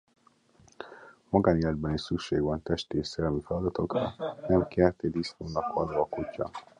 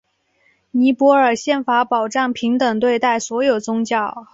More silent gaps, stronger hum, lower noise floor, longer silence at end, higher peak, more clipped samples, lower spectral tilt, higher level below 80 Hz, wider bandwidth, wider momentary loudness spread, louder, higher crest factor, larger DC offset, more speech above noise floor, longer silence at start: neither; neither; about the same, -62 dBFS vs -61 dBFS; about the same, 0.2 s vs 0.1 s; second, -8 dBFS vs -2 dBFS; neither; first, -7 dB/octave vs -4 dB/octave; first, -48 dBFS vs -62 dBFS; first, 10 kHz vs 8 kHz; first, 10 LU vs 7 LU; second, -30 LUFS vs -17 LUFS; first, 22 dB vs 16 dB; neither; second, 33 dB vs 44 dB; about the same, 0.8 s vs 0.75 s